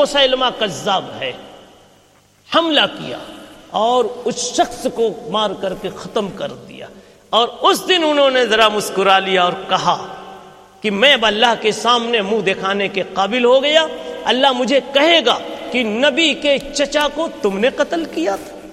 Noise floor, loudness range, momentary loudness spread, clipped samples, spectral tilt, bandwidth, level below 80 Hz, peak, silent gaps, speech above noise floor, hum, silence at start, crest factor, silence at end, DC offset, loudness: -52 dBFS; 5 LU; 13 LU; under 0.1%; -3 dB/octave; 15 kHz; -50 dBFS; 0 dBFS; none; 35 dB; none; 0 s; 16 dB; 0 s; under 0.1%; -16 LUFS